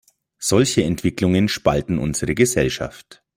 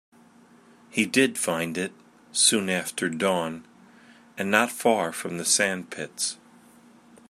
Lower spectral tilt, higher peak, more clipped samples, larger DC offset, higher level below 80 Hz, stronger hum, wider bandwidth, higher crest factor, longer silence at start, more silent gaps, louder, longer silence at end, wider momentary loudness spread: first, -5 dB/octave vs -2.5 dB/octave; about the same, -2 dBFS vs -4 dBFS; neither; neither; first, -42 dBFS vs -74 dBFS; neither; about the same, 16.5 kHz vs 16 kHz; second, 18 dB vs 24 dB; second, 0.4 s vs 0.95 s; neither; first, -19 LUFS vs -24 LUFS; second, 0.35 s vs 0.95 s; second, 7 LU vs 14 LU